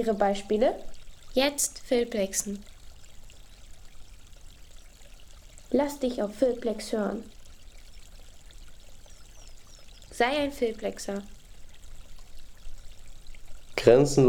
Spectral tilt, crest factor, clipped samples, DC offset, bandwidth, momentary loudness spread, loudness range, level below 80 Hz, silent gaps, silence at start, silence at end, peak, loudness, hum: -4.5 dB/octave; 24 dB; under 0.1%; under 0.1%; 19 kHz; 17 LU; 10 LU; -48 dBFS; none; 0 s; 0 s; -6 dBFS; -27 LUFS; none